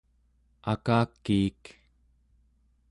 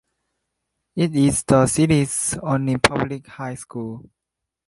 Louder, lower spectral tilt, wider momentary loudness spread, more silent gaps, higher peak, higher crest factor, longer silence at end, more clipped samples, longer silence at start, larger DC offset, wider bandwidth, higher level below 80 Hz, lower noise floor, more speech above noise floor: second, -28 LUFS vs -19 LUFS; first, -7.5 dB/octave vs -5 dB/octave; second, 7 LU vs 15 LU; neither; second, -12 dBFS vs 0 dBFS; about the same, 18 dB vs 22 dB; first, 1.4 s vs 0.65 s; neither; second, 0.65 s vs 0.95 s; neither; about the same, 11 kHz vs 12 kHz; second, -54 dBFS vs -46 dBFS; second, -67 dBFS vs -83 dBFS; second, 40 dB vs 63 dB